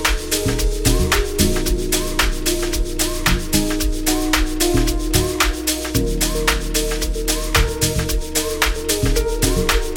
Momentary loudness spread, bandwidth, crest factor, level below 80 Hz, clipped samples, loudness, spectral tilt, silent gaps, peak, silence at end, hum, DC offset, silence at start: 4 LU; 19 kHz; 18 dB; -22 dBFS; under 0.1%; -19 LUFS; -3.5 dB/octave; none; 0 dBFS; 0 s; none; under 0.1%; 0 s